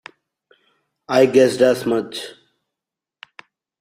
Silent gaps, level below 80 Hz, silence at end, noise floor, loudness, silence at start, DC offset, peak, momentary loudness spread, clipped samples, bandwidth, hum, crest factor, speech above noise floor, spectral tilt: none; -64 dBFS; 1.5 s; -86 dBFS; -17 LUFS; 1.1 s; under 0.1%; -2 dBFS; 17 LU; under 0.1%; 15.5 kHz; none; 20 dB; 70 dB; -5 dB/octave